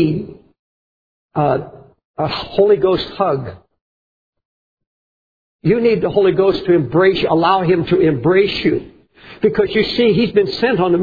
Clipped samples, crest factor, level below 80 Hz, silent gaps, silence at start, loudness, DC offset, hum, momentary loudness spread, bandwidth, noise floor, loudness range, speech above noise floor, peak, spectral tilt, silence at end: under 0.1%; 16 dB; -46 dBFS; 0.59-1.29 s, 2.05-2.14 s, 3.81-4.33 s, 4.45-4.77 s, 4.87-5.59 s; 0 s; -15 LUFS; under 0.1%; none; 9 LU; 5 kHz; under -90 dBFS; 6 LU; over 75 dB; 0 dBFS; -8.5 dB/octave; 0 s